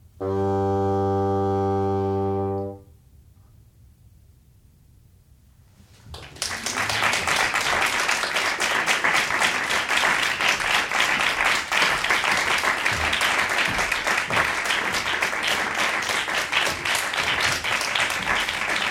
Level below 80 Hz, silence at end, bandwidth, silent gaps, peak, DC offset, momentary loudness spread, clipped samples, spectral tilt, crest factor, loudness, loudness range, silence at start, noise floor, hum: -52 dBFS; 0 s; 17 kHz; none; -6 dBFS; under 0.1%; 5 LU; under 0.1%; -2.5 dB/octave; 18 dB; -21 LUFS; 9 LU; 0.2 s; -54 dBFS; none